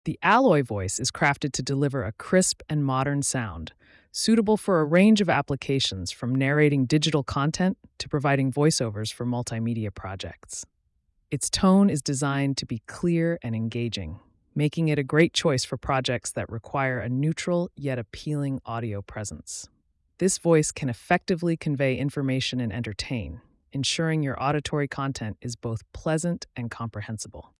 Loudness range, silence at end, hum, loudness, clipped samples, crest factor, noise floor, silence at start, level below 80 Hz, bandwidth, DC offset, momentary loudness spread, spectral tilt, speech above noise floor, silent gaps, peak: 6 LU; 0.2 s; none; -25 LUFS; under 0.1%; 18 dB; -70 dBFS; 0.05 s; -54 dBFS; 12 kHz; under 0.1%; 14 LU; -5 dB/octave; 45 dB; none; -8 dBFS